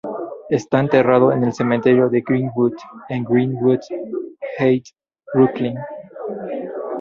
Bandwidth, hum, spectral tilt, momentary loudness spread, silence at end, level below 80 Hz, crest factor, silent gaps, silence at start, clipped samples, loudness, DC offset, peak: 7.4 kHz; none; -8 dB/octave; 15 LU; 0 s; -58 dBFS; 18 dB; none; 0.05 s; under 0.1%; -19 LUFS; under 0.1%; 0 dBFS